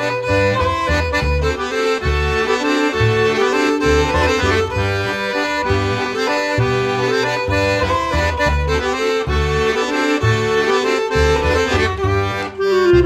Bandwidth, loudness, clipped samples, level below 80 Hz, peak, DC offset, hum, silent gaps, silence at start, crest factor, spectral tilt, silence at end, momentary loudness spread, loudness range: 14.5 kHz; -17 LUFS; under 0.1%; -28 dBFS; -2 dBFS; 0.1%; none; none; 0 s; 14 dB; -5.5 dB/octave; 0 s; 4 LU; 1 LU